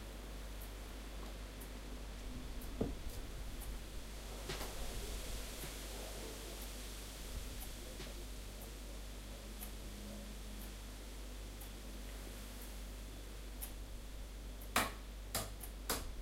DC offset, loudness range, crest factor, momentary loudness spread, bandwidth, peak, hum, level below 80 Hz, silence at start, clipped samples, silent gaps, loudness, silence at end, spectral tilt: under 0.1%; 6 LU; 30 dB; 8 LU; 16 kHz; -16 dBFS; none; -48 dBFS; 0 s; under 0.1%; none; -47 LUFS; 0 s; -3.5 dB/octave